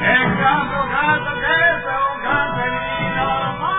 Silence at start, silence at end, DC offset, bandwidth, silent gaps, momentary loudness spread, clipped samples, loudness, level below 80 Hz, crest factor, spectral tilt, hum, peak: 0 s; 0 s; under 0.1%; 4 kHz; none; 6 LU; under 0.1%; -18 LUFS; -40 dBFS; 16 dB; -8.5 dB/octave; none; -2 dBFS